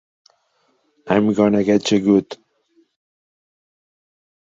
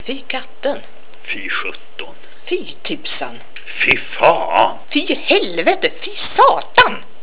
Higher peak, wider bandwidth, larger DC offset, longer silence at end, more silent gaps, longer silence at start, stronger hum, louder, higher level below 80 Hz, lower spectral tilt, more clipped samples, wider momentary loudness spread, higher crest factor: about the same, -2 dBFS vs 0 dBFS; first, 7.8 kHz vs 4 kHz; second, under 0.1% vs 7%; first, 2.25 s vs 0.2 s; neither; first, 1.05 s vs 0.05 s; neither; about the same, -17 LUFS vs -16 LUFS; second, -58 dBFS vs -52 dBFS; about the same, -6 dB/octave vs -7 dB/octave; second, under 0.1% vs 0.1%; second, 13 LU vs 18 LU; about the same, 18 dB vs 18 dB